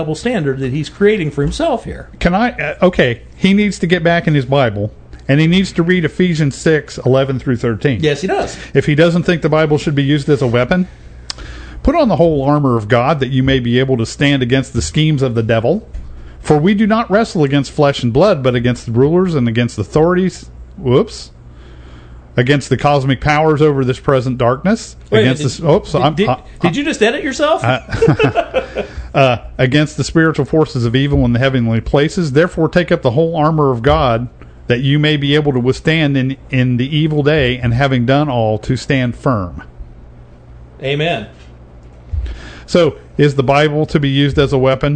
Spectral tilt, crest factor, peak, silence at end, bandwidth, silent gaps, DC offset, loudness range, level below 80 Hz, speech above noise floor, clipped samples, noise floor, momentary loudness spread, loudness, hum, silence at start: -6.5 dB/octave; 14 dB; 0 dBFS; 0 s; 9.4 kHz; none; under 0.1%; 3 LU; -32 dBFS; 24 dB; under 0.1%; -37 dBFS; 7 LU; -14 LUFS; none; 0 s